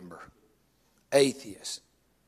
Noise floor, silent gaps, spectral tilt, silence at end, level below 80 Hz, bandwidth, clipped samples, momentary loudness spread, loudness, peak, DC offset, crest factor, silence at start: -68 dBFS; none; -3.5 dB/octave; 0.5 s; -72 dBFS; 14.5 kHz; under 0.1%; 22 LU; -28 LUFS; -10 dBFS; under 0.1%; 22 dB; 0 s